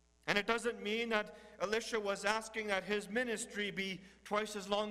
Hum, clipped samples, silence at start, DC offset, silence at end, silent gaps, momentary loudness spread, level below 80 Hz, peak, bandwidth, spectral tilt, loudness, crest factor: none; under 0.1%; 0.25 s; under 0.1%; 0 s; none; 5 LU; -68 dBFS; -12 dBFS; 15.5 kHz; -3 dB/octave; -37 LUFS; 24 dB